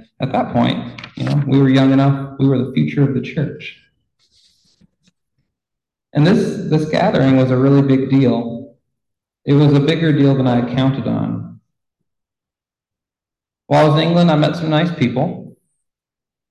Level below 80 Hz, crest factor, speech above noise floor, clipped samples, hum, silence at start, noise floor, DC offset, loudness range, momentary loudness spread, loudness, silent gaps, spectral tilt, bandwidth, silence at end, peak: -50 dBFS; 14 dB; 74 dB; under 0.1%; none; 0.2 s; -88 dBFS; under 0.1%; 7 LU; 12 LU; -15 LUFS; none; -8 dB/octave; 8.6 kHz; 1 s; -2 dBFS